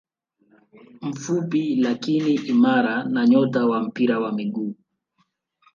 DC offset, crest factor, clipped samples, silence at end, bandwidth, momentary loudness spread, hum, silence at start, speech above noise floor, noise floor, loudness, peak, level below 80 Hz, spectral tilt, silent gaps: under 0.1%; 16 dB; under 0.1%; 1 s; 7.2 kHz; 12 LU; none; 0.95 s; 49 dB; -69 dBFS; -21 LUFS; -6 dBFS; -72 dBFS; -6.5 dB/octave; none